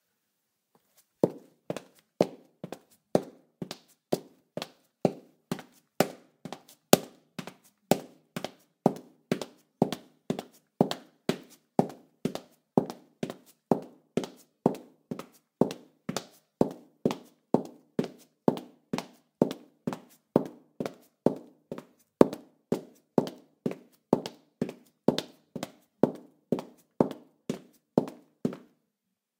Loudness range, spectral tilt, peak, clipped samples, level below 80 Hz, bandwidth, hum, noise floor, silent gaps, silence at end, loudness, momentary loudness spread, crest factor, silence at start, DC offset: 4 LU; -5.5 dB/octave; 0 dBFS; under 0.1%; -68 dBFS; 17.5 kHz; none; -83 dBFS; none; 0.8 s; -32 LUFS; 15 LU; 32 dB; 1.25 s; under 0.1%